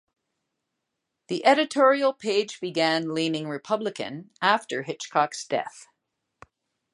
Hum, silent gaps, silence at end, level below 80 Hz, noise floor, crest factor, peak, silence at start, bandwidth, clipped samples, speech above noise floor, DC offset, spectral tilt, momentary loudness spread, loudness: none; none; 1.1 s; -76 dBFS; -82 dBFS; 22 dB; -4 dBFS; 1.3 s; 11 kHz; under 0.1%; 57 dB; under 0.1%; -4 dB/octave; 12 LU; -25 LUFS